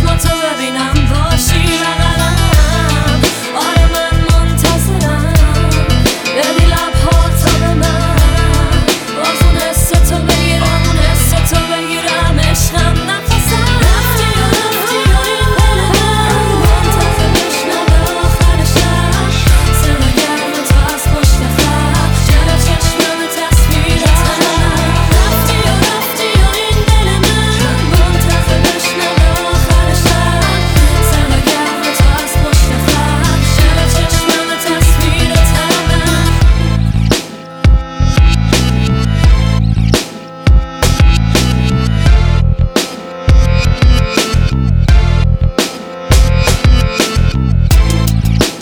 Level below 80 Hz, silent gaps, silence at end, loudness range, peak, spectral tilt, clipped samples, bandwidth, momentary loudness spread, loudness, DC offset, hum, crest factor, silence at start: -14 dBFS; none; 0 s; 1 LU; 0 dBFS; -4.5 dB/octave; under 0.1%; over 20 kHz; 3 LU; -11 LUFS; under 0.1%; none; 10 dB; 0 s